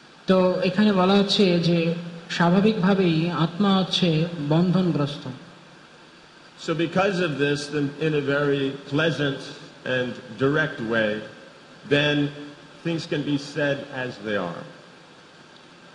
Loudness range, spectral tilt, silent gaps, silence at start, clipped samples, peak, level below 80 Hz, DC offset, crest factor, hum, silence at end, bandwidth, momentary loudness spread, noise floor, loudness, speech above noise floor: 6 LU; -6.5 dB/octave; none; 0.3 s; under 0.1%; -8 dBFS; -60 dBFS; under 0.1%; 16 dB; none; 0.05 s; 10.5 kHz; 14 LU; -49 dBFS; -23 LUFS; 27 dB